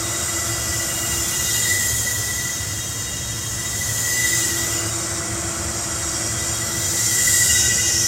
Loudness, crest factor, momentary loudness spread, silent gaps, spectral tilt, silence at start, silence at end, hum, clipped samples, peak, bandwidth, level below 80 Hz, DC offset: -19 LUFS; 18 dB; 9 LU; none; -1 dB/octave; 0 s; 0 s; none; under 0.1%; -4 dBFS; 16 kHz; -40 dBFS; under 0.1%